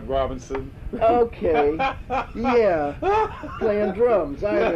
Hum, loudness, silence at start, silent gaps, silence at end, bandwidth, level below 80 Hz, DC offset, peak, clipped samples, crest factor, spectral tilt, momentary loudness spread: none; -22 LUFS; 0 s; none; 0 s; 7.6 kHz; -40 dBFS; under 0.1%; -8 dBFS; under 0.1%; 12 dB; -7 dB/octave; 8 LU